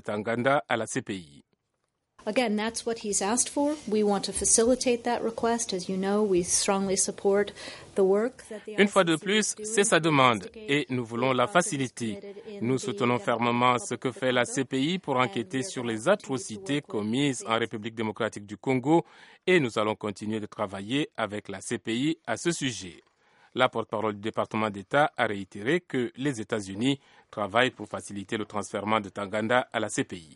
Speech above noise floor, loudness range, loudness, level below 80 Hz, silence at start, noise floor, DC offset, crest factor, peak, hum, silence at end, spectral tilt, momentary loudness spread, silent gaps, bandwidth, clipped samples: 52 dB; 5 LU; -27 LUFS; -62 dBFS; 0.05 s; -79 dBFS; under 0.1%; 22 dB; -6 dBFS; none; 0.1 s; -3.5 dB/octave; 10 LU; none; 11.5 kHz; under 0.1%